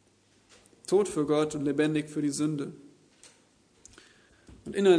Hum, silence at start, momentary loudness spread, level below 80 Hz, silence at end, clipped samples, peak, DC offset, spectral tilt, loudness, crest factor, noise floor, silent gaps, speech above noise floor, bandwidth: none; 0.9 s; 12 LU; -66 dBFS; 0 s; under 0.1%; -10 dBFS; under 0.1%; -5.5 dB/octave; -29 LUFS; 20 dB; -64 dBFS; none; 37 dB; 11 kHz